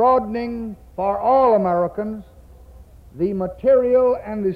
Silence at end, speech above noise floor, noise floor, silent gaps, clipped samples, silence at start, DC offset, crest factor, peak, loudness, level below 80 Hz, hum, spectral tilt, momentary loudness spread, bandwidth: 0 s; 25 dB; -44 dBFS; none; under 0.1%; 0 s; under 0.1%; 12 dB; -6 dBFS; -19 LUFS; -46 dBFS; none; -9.5 dB/octave; 14 LU; 5 kHz